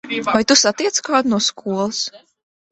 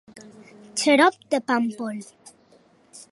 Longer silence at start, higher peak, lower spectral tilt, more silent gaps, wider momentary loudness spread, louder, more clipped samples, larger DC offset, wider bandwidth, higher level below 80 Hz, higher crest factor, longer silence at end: about the same, 0.05 s vs 0.15 s; first, 0 dBFS vs -4 dBFS; about the same, -2 dB/octave vs -3 dB/octave; neither; second, 9 LU vs 15 LU; first, -17 LUFS vs -22 LUFS; neither; neither; second, 8.4 kHz vs 11.5 kHz; first, -58 dBFS vs -76 dBFS; about the same, 18 dB vs 22 dB; first, 0.55 s vs 0.15 s